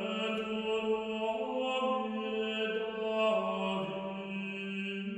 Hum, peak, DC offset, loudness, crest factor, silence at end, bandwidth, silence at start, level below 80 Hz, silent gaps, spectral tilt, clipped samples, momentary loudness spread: none; -20 dBFS; under 0.1%; -34 LUFS; 14 dB; 0 s; 8.6 kHz; 0 s; -72 dBFS; none; -5.5 dB/octave; under 0.1%; 7 LU